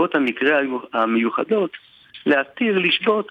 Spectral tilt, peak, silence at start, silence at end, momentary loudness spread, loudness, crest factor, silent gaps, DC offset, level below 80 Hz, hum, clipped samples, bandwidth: -6.5 dB/octave; -6 dBFS; 0 s; 0.05 s; 5 LU; -20 LUFS; 14 dB; none; under 0.1%; -72 dBFS; none; under 0.1%; 6.4 kHz